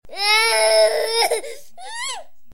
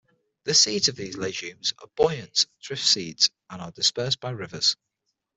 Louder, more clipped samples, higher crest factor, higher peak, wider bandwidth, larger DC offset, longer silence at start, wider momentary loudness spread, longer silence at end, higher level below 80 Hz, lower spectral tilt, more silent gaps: first, -17 LUFS vs -23 LUFS; neither; about the same, 16 dB vs 20 dB; about the same, -4 dBFS vs -6 dBFS; first, 16.5 kHz vs 8.4 kHz; first, 2% vs under 0.1%; second, 0 s vs 0.45 s; first, 19 LU vs 13 LU; second, 0.3 s vs 0.65 s; about the same, -60 dBFS vs -62 dBFS; second, 1.5 dB/octave vs -1.5 dB/octave; neither